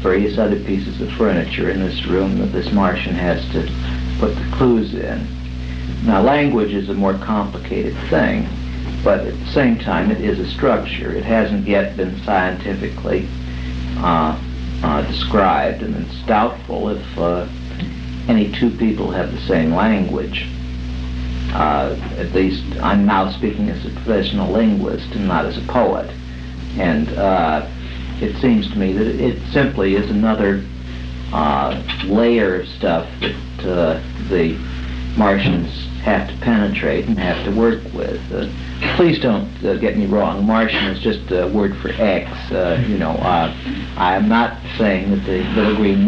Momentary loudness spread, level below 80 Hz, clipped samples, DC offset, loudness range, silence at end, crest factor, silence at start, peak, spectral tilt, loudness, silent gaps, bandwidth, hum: 10 LU; -28 dBFS; under 0.1%; under 0.1%; 2 LU; 0 s; 16 dB; 0 s; -2 dBFS; -7.5 dB/octave; -18 LUFS; none; 7.2 kHz; none